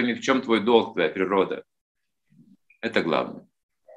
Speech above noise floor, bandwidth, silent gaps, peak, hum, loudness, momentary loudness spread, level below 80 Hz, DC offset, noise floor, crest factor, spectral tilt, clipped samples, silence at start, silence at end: 36 dB; 9.4 kHz; 1.81-1.95 s; -4 dBFS; none; -24 LUFS; 14 LU; -72 dBFS; under 0.1%; -60 dBFS; 22 dB; -5 dB/octave; under 0.1%; 0 s; 0.55 s